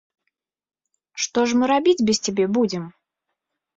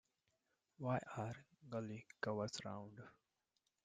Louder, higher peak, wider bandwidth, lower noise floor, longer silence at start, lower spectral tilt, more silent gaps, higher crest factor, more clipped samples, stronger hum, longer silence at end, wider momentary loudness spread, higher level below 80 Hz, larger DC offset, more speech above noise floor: first, -20 LUFS vs -47 LUFS; first, -6 dBFS vs -26 dBFS; second, 8.4 kHz vs 9.4 kHz; second, -80 dBFS vs -87 dBFS; first, 1.15 s vs 0.8 s; second, -4 dB/octave vs -5.5 dB/octave; neither; second, 16 dB vs 22 dB; neither; neither; about the same, 0.85 s vs 0.75 s; about the same, 13 LU vs 14 LU; first, -62 dBFS vs -80 dBFS; neither; first, 61 dB vs 41 dB